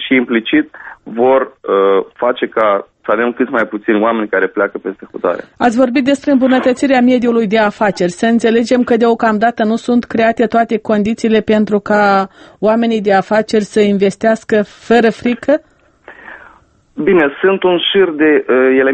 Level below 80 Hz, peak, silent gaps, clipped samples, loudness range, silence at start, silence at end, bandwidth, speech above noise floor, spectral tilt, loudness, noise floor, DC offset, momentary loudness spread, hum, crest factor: -50 dBFS; 0 dBFS; none; under 0.1%; 3 LU; 0 s; 0 s; 8.8 kHz; 34 dB; -5.5 dB/octave; -13 LUFS; -47 dBFS; under 0.1%; 6 LU; none; 12 dB